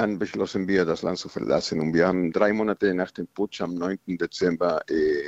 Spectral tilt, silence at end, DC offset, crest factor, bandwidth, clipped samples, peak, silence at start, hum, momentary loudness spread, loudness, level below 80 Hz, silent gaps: -6 dB/octave; 0 s; under 0.1%; 20 dB; 8.2 kHz; under 0.1%; -6 dBFS; 0 s; none; 7 LU; -25 LUFS; -58 dBFS; none